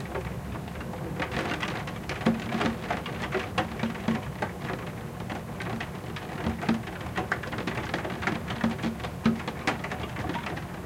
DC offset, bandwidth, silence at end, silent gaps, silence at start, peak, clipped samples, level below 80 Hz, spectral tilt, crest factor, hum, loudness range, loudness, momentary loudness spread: under 0.1%; 16.5 kHz; 0 s; none; 0 s; -10 dBFS; under 0.1%; -46 dBFS; -6 dB/octave; 22 dB; none; 3 LU; -32 LUFS; 7 LU